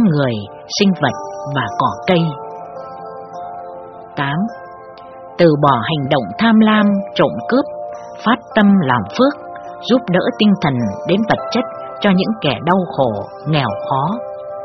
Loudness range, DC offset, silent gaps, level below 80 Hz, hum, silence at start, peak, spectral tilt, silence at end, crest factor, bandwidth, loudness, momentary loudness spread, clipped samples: 6 LU; under 0.1%; none; -52 dBFS; none; 0 s; 0 dBFS; -5 dB/octave; 0 s; 16 dB; 6.4 kHz; -16 LUFS; 18 LU; under 0.1%